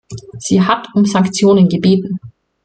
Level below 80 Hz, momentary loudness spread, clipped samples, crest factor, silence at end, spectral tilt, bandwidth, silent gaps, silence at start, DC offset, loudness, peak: -50 dBFS; 15 LU; under 0.1%; 12 dB; 0.35 s; -6 dB/octave; 9.2 kHz; none; 0.1 s; under 0.1%; -13 LUFS; -2 dBFS